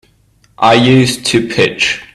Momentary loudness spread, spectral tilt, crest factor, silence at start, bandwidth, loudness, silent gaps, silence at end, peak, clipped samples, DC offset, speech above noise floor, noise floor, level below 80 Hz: 6 LU; -4.5 dB/octave; 12 dB; 0.6 s; 14 kHz; -11 LUFS; none; 0.1 s; 0 dBFS; under 0.1%; under 0.1%; 40 dB; -51 dBFS; -46 dBFS